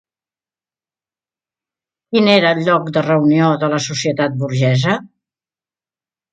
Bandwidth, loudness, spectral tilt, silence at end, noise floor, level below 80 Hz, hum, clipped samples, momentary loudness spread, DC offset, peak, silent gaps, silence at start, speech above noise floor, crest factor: 9 kHz; -15 LUFS; -5.5 dB/octave; 1.25 s; under -90 dBFS; -60 dBFS; none; under 0.1%; 7 LU; under 0.1%; 0 dBFS; none; 2.1 s; over 76 dB; 18 dB